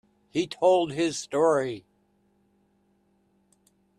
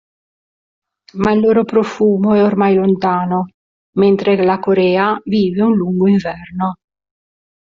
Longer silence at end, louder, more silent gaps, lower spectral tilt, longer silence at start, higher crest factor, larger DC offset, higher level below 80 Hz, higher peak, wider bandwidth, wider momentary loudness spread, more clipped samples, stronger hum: first, 2.2 s vs 1.05 s; second, -25 LUFS vs -14 LUFS; second, none vs 3.54-3.93 s; second, -4.5 dB/octave vs -6.5 dB/octave; second, 0.35 s vs 1.15 s; about the same, 18 dB vs 14 dB; neither; second, -70 dBFS vs -52 dBFS; second, -10 dBFS vs -2 dBFS; first, 11.5 kHz vs 7.2 kHz; about the same, 11 LU vs 9 LU; neither; neither